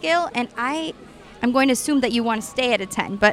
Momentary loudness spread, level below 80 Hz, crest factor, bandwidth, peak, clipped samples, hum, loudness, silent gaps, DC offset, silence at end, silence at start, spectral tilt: 8 LU; -52 dBFS; 20 dB; 16 kHz; 0 dBFS; under 0.1%; none; -21 LUFS; none; under 0.1%; 0 s; 0 s; -3.5 dB/octave